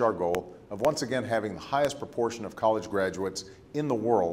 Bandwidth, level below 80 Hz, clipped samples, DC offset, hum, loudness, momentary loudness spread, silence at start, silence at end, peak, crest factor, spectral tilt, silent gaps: 16 kHz; -60 dBFS; under 0.1%; under 0.1%; none; -29 LUFS; 7 LU; 0 s; 0 s; -12 dBFS; 18 dB; -5 dB/octave; none